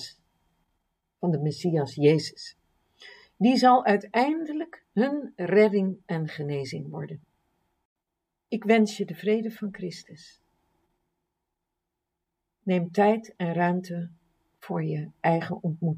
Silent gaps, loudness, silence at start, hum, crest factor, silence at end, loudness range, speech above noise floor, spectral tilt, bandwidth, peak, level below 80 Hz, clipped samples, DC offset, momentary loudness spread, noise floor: 7.85-7.96 s; -26 LUFS; 0 s; none; 22 dB; 0 s; 9 LU; 59 dB; -7 dB/octave; 15.5 kHz; -6 dBFS; -74 dBFS; under 0.1%; under 0.1%; 16 LU; -84 dBFS